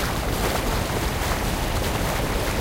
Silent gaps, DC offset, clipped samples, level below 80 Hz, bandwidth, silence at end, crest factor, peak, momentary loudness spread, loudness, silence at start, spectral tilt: none; under 0.1%; under 0.1%; -28 dBFS; 16 kHz; 0 s; 14 dB; -10 dBFS; 1 LU; -24 LUFS; 0 s; -4.5 dB/octave